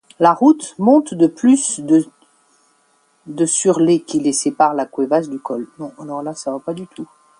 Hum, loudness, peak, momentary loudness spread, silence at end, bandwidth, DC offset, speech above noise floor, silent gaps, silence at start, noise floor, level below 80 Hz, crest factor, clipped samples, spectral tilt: none; -16 LUFS; 0 dBFS; 16 LU; 0.35 s; 11.5 kHz; under 0.1%; 43 dB; none; 0.2 s; -59 dBFS; -66 dBFS; 16 dB; under 0.1%; -5 dB/octave